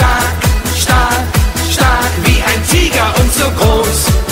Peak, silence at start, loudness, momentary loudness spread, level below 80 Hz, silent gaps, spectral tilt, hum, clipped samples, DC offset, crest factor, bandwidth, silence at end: 0 dBFS; 0 s; -11 LUFS; 3 LU; -16 dBFS; none; -4 dB/octave; none; under 0.1%; under 0.1%; 10 dB; 16.5 kHz; 0 s